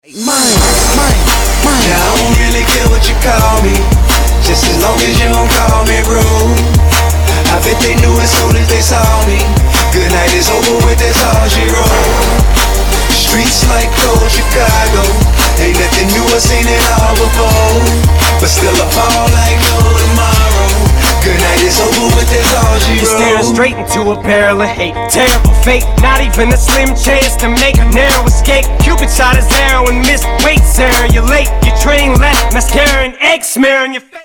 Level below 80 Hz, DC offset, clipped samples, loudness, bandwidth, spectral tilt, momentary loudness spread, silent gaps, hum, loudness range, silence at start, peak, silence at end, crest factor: -12 dBFS; under 0.1%; under 0.1%; -9 LUFS; over 20 kHz; -4 dB/octave; 2 LU; none; none; 1 LU; 0.15 s; 0 dBFS; 0.05 s; 8 dB